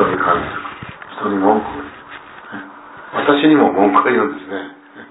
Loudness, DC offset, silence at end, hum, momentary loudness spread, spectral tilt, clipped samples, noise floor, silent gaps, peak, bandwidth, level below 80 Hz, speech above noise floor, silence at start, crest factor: -15 LUFS; under 0.1%; 0.05 s; none; 22 LU; -9.5 dB/octave; under 0.1%; -36 dBFS; none; 0 dBFS; 4 kHz; -50 dBFS; 22 dB; 0 s; 16 dB